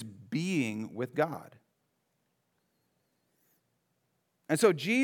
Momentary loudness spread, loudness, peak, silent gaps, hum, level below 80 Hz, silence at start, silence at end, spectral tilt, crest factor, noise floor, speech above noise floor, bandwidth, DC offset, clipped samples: 11 LU; -31 LUFS; -12 dBFS; none; none; under -90 dBFS; 0 s; 0 s; -5 dB/octave; 22 dB; -78 dBFS; 49 dB; 18 kHz; under 0.1%; under 0.1%